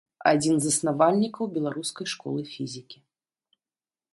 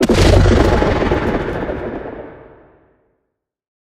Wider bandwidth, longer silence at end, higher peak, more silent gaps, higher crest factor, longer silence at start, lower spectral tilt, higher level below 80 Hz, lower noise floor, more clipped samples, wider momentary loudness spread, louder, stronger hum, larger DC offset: second, 11.5 kHz vs 14.5 kHz; second, 1.2 s vs 1.65 s; second, -6 dBFS vs 0 dBFS; neither; first, 22 dB vs 16 dB; first, 0.2 s vs 0 s; second, -4.5 dB/octave vs -6.5 dB/octave; second, -70 dBFS vs -22 dBFS; first, under -90 dBFS vs -74 dBFS; neither; second, 13 LU vs 19 LU; second, -25 LUFS vs -15 LUFS; neither; neither